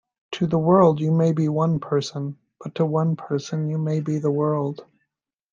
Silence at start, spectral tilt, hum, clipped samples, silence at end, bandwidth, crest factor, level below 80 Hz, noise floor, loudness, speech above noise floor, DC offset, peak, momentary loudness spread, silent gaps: 0.3 s; -8 dB/octave; none; under 0.1%; 0.7 s; 7.4 kHz; 18 dB; -62 dBFS; -79 dBFS; -22 LUFS; 58 dB; under 0.1%; -4 dBFS; 15 LU; none